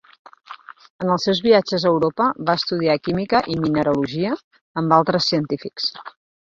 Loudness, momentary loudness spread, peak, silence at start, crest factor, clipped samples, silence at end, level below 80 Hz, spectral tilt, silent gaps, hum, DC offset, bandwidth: -20 LUFS; 14 LU; -2 dBFS; 0.5 s; 18 dB; under 0.1%; 0.5 s; -56 dBFS; -6 dB/octave; 0.90-0.99 s, 4.44-4.51 s, 4.61-4.74 s; none; under 0.1%; 7.6 kHz